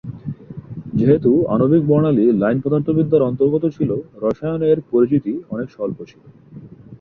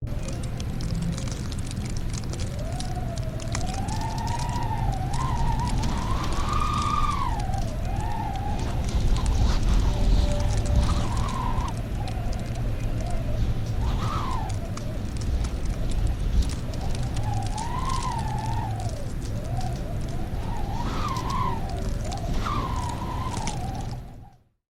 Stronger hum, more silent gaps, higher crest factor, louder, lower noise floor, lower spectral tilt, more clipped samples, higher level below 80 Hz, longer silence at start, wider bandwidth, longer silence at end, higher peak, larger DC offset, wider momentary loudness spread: neither; neither; about the same, 16 dB vs 16 dB; first, -17 LUFS vs -29 LUFS; second, -38 dBFS vs -49 dBFS; first, -11.5 dB/octave vs -5.5 dB/octave; neither; second, -50 dBFS vs -28 dBFS; about the same, 0.05 s vs 0 s; second, 5.8 kHz vs 15.5 kHz; second, 0.05 s vs 0.5 s; first, -2 dBFS vs -10 dBFS; neither; first, 16 LU vs 7 LU